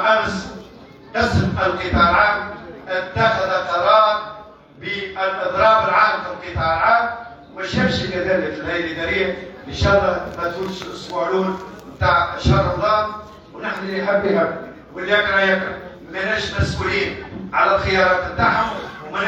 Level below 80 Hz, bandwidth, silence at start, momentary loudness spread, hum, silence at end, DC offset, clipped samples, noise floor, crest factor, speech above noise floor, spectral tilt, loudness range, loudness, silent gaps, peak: -38 dBFS; 8.6 kHz; 0 s; 16 LU; none; 0 s; under 0.1%; under 0.1%; -41 dBFS; 16 dB; 23 dB; -5.5 dB/octave; 3 LU; -19 LUFS; none; -4 dBFS